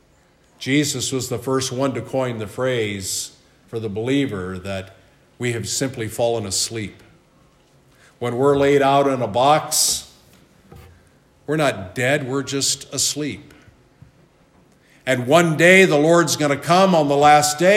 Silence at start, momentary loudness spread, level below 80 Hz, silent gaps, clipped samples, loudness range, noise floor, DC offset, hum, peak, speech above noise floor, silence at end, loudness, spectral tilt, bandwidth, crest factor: 0.6 s; 16 LU; -60 dBFS; none; under 0.1%; 9 LU; -56 dBFS; under 0.1%; none; 0 dBFS; 38 dB; 0 s; -18 LUFS; -4 dB/octave; 16 kHz; 20 dB